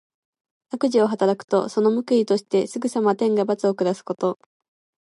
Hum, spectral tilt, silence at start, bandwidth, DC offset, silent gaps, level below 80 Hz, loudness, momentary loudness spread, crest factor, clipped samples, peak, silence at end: none; -6 dB/octave; 0.75 s; 11.5 kHz; under 0.1%; 1.44-1.48 s; -76 dBFS; -22 LUFS; 6 LU; 14 dB; under 0.1%; -8 dBFS; 0.7 s